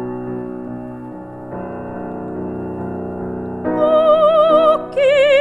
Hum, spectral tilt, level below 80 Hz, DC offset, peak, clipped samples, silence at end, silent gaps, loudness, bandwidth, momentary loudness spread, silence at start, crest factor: none; -6.5 dB/octave; -50 dBFS; under 0.1%; -2 dBFS; under 0.1%; 0 s; none; -16 LUFS; 9.6 kHz; 18 LU; 0 s; 14 dB